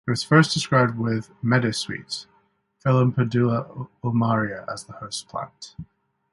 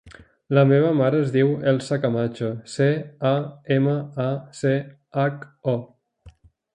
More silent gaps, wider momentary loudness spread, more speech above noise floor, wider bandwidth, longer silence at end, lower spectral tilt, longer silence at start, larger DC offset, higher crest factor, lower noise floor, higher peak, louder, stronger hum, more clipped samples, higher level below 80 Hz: neither; first, 16 LU vs 9 LU; first, 42 dB vs 29 dB; first, 11.5 kHz vs 9.8 kHz; about the same, 0.5 s vs 0.45 s; second, -6 dB/octave vs -7.5 dB/octave; about the same, 0.05 s vs 0.05 s; neither; about the same, 22 dB vs 20 dB; first, -64 dBFS vs -51 dBFS; about the same, -2 dBFS vs -2 dBFS; about the same, -23 LUFS vs -22 LUFS; neither; neither; about the same, -58 dBFS vs -60 dBFS